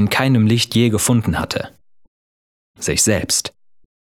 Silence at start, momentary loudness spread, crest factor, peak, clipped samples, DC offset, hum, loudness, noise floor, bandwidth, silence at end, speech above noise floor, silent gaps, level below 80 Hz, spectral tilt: 0 s; 11 LU; 18 dB; 0 dBFS; under 0.1%; under 0.1%; none; -17 LUFS; under -90 dBFS; 17.5 kHz; 0.55 s; over 74 dB; 2.08-2.74 s; -42 dBFS; -4 dB/octave